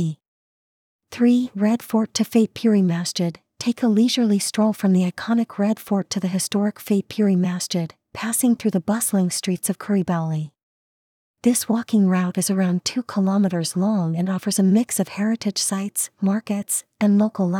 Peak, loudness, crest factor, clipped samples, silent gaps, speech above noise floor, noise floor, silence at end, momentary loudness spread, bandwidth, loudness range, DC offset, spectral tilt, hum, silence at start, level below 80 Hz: -6 dBFS; -21 LUFS; 16 dB; under 0.1%; 0.28-0.99 s, 10.63-11.34 s; over 70 dB; under -90 dBFS; 0 s; 6 LU; 18 kHz; 2 LU; under 0.1%; -5 dB/octave; none; 0 s; -68 dBFS